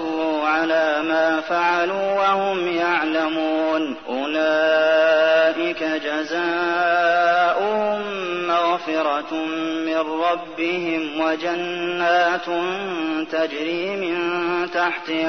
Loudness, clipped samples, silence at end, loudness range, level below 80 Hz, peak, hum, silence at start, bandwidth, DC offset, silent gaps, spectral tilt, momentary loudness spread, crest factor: -20 LUFS; under 0.1%; 0 s; 4 LU; -66 dBFS; -8 dBFS; none; 0 s; 6.4 kHz; 0.2%; none; -4.5 dB/octave; 7 LU; 14 dB